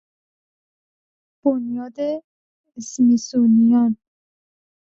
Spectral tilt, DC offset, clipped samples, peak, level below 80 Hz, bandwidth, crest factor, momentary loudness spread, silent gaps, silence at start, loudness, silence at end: -6.5 dB/octave; under 0.1%; under 0.1%; -6 dBFS; -66 dBFS; 7.6 kHz; 14 dB; 16 LU; 2.24-2.64 s; 1.45 s; -19 LUFS; 1 s